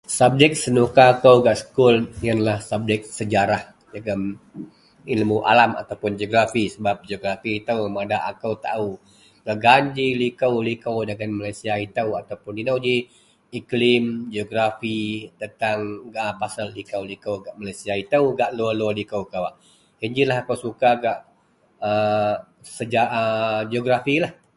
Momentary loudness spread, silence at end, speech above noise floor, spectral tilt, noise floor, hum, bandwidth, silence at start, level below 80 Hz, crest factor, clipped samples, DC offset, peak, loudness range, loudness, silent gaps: 14 LU; 0.25 s; 39 dB; -5 dB/octave; -60 dBFS; none; 11.5 kHz; 0.1 s; -54 dBFS; 22 dB; under 0.1%; under 0.1%; 0 dBFS; 6 LU; -21 LUFS; none